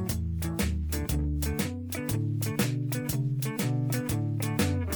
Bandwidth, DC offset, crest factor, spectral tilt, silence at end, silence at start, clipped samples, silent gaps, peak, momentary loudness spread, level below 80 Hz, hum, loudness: over 20 kHz; under 0.1%; 16 dB; -5.5 dB/octave; 0 s; 0 s; under 0.1%; none; -12 dBFS; 3 LU; -40 dBFS; none; -30 LUFS